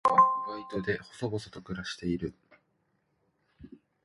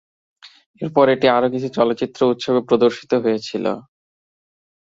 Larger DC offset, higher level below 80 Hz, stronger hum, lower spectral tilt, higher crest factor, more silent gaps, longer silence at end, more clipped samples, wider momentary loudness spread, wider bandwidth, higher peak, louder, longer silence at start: neither; about the same, -58 dBFS vs -62 dBFS; neither; about the same, -6 dB/octave vs -6 dB/octave; about the same, 22 dB vs 18 dB; second, none vs 0.66-0.74 s; second, 0.35 s vs 1.05 s; neither; first, 15 LU vs 9 LU; first, 11.5 kHz vs 7.8 kHz; second, -10 dBFS vs 0 dBFS; second, -31 LUFS vs -18 LUFS; second, 0.05 s vs 0.45 s